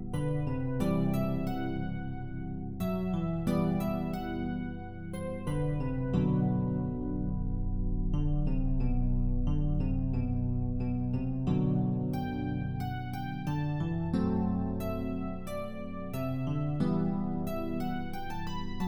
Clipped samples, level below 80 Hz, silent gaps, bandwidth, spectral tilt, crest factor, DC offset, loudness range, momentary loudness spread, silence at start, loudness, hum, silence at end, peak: under 0.1%; -38 dBFS; none; 17.5 kHz; -8.5 dB/octave; 14 dB; under 0.1%; 2 LU; 8 LU; 0 s; -33 LUFS; none; 0 s; -16 dBFS